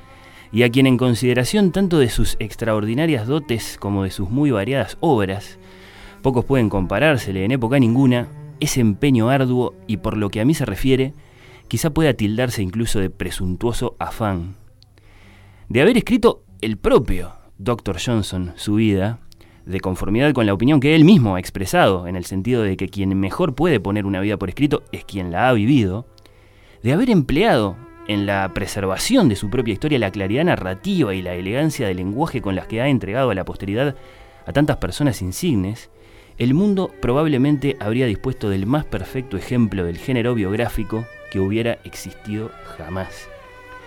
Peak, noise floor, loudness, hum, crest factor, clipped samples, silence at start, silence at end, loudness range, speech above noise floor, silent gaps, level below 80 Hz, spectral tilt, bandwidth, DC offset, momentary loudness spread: -2 dBFS; -48 dBFS; -19 LUFS; none; 18 dB; under 0.1%; 0.25 s; 0 s; 5 LU; 29 dB; none; -36 dBFS; -6.5 dB/octave; 17.5 kHz; under 0.1%; 11 LU